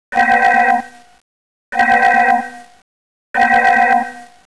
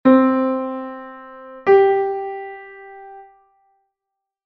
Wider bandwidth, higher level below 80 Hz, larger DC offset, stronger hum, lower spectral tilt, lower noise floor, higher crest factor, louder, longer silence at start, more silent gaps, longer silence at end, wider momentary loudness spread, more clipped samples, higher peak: first, 11 kHz vs 4.9 kHz; first, -54 dBFS vs -64 dBFS; first, 0.6% vs under 0.1%; neither; about the same, -3.5 dB/octave vs -4.5 dB/octave; first, under -90 dBFS vs -83 dBFS; second, 10 dB vs 18 dB; first, -13 LUFS vs -18 LUFS; about the same, 0.1 s vs 0.05 s; first, 1.21-1.72 s, 2.82-3.34 s vs none; second, 0.3 s vs 1.25 s; second, 12 LU vs 25 LU; neither; about the same, -4 dBFS vs -2 dBFS